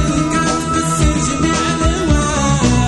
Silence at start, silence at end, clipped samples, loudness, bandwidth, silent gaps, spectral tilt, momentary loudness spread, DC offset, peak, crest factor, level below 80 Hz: 0 s; 0 s; under 0.1%; -15 LUFS; 12 kHz; none; -4.5 dB/octave; 2 LU; under 0.1%; 0 dBFS; 14 dB; -22 dBFS